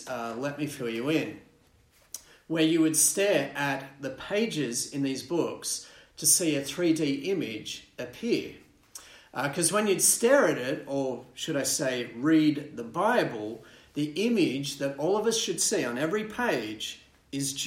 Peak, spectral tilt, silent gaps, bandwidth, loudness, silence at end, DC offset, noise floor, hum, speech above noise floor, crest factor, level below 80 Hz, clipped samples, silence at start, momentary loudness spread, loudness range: -8 dBFS; -3 dB/octave; none; 16 kHz; -27 LUFS; 0 s; under 0.1%; -62 dBFS; none; 34 dB; 20 dB; -66 dBFS; under 0.1%; 0 s; 17 LU; 3 LU